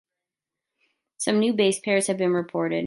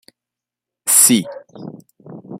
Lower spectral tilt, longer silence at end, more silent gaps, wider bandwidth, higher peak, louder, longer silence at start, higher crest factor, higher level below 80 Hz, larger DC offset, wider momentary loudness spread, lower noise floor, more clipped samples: first, -4 dB/octave vs -2 dB/octave; about the same, 0 s vs 0 s; neither; second, 11.5 kHz vs 16.5 kHz; second, -8 dBFS vs 0 dBFS; second, -23 LUFS vs -11 LUFS; first, 1.2 s vs 0.85 s; about the same, 18 dB vs 20 dB; second, -74 dBFS vs -68 dBFS; neither; second, 5 LU vs 26 LU; about the same, -87 dBFS vs -86 dBFS; neither